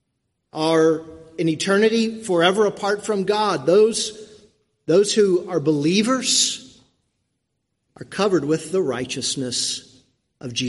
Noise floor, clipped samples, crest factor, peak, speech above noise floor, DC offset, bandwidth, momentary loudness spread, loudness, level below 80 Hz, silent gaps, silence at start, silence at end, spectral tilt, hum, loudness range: -75 dBFS; under 0.1%; 18 dB; -4 dBFS; 56 dB; under 0.1%; 11.5 kHz; 11 LU; -20 LUFS; -62 dBFS; none; 0.55 s; 0 s; -3.5 dB/octave; none; 5 LU